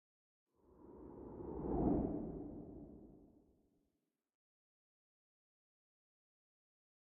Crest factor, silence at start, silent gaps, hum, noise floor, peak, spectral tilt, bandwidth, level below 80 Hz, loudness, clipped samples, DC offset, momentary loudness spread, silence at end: 24 dB; 0.75 s; none; none; -88 dBFS; -24 dBFS; -10 dB/octave; 2.5 kHz; -58 dBFS; -42 LUFS; under 0.1%; under 0.1%; 22 LU; 3.8 s